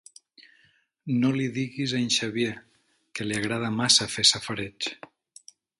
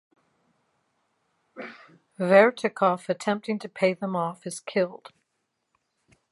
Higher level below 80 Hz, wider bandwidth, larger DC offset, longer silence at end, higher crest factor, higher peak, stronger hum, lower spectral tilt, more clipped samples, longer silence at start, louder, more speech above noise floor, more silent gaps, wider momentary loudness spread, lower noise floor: first, -62 dBFS vs -80 dBFS; about the same, 11.5 kHz vs 11.5 kHz; neither; second, 0.85 s vs 1.35 s; about the same, 22 dB vs 24 dB; about the same, -6 dBFS vs -4 dBFS; neither; second, -3 dB/octave vs -5.5 dB/octave; neither; second, 1.05 s vs 1.55 s; about the same, -25 LUFS vs -25 LUFS; second, 38 dB vs 53 dB; neither; second, 14 LU vs 22 LU; second, -64 dBFS vs -78 dBFS